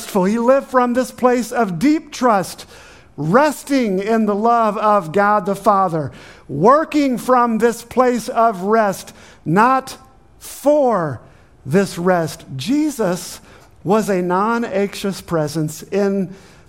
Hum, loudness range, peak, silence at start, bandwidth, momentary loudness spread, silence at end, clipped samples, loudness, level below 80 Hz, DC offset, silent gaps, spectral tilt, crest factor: none; 4 LU; 0 dBFS; 0 s; 16.5 kHz; 14 LU; 0.3 s; under 0.1%; -17 LUFS; -52 dBFS; under 0.1%; none; -6 dB/octave; 16 dB